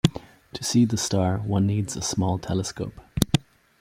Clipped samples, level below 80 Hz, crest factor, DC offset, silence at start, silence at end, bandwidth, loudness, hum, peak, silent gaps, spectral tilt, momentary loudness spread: under 0.1%; -46 dBFS; 22 dB; under 0.1%; 0.05 s; 0.4 s; 16 kHz; -25 LUFS; none; -2 dBFS; none; -5.5 dB/octave; 11 LU